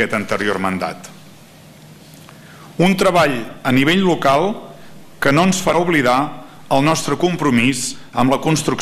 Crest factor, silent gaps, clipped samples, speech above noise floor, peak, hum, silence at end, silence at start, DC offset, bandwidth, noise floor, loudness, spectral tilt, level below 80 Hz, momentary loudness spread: 16 dB; none; under 0.1%; 26 dB; -2 dBFS; none; 0 s; 0 s; under 0.1%; 15 kHz; -42 dBFS; -16 LUFS; -5 dB/octave; -46 dBFS; 9 LU